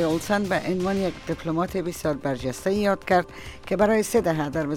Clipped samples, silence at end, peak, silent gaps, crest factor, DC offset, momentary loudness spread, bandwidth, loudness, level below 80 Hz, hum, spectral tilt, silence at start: under 0.1%; 0 s; -8 dBFS; none; 16 dB; under 0.1%; 7 LU; 17.5 kHz; -24 LUFS; -48 dBFS; none; -5.5 dB/octave; 0 s